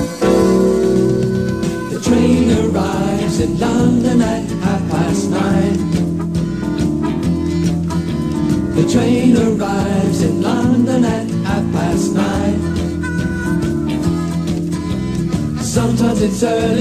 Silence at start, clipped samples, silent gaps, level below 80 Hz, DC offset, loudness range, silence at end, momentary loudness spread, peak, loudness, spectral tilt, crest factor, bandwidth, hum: 0 s; under 0.1%; none; -32 dBFS; 0.3%; 3 LU; 0 s; 7 LU; -2 dBFS; -16 LUFS; -6.5 dB/octave; 14 dB; 13 kHz; none